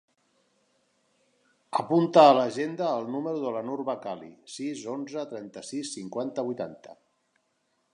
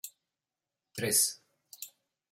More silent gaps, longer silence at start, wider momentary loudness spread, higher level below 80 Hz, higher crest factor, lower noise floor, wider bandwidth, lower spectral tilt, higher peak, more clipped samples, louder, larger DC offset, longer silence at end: neither; first, 1.7 s vs 0.05 s; about the same, 19 LU vs 21 LU; about the same, -82 dBFS vs -80 dBFS; about the same, 24 dB vs 24 dB; second, -74 dBFS vs under -90 dBFS; second, 11 kHz vs 16.5 kHz; first, -5.5 dB/octave vs -1.5 dB/octave; first, -4 dBFS vs -12 dBFS; neither; about the same, -27 LUFS vs -28 LUFS; neither; first, 1 s vs 0.45 s